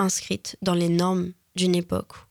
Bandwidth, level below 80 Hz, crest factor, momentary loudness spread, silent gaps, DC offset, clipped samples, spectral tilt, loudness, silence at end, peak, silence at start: 17 kHz; -56 dBFS; 18 dB; 9 LU; none; under 0.1%; under 0.1%; -5 dB/octave; -25 LUFS; 0.1 s; -6 dBFS; 0 s